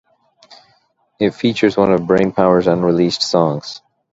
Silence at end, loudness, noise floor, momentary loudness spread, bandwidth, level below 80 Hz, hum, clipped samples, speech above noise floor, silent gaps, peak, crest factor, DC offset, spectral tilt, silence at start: 0.35 s; -15 LUFS; -59 dBFS; 8 LU; 8 kHz; -50 dBFS; none; under 0.1%; 45 dB; none; 0 dBFS; 16 dB; under 0.1%; -6 dB/octave; 0.5 s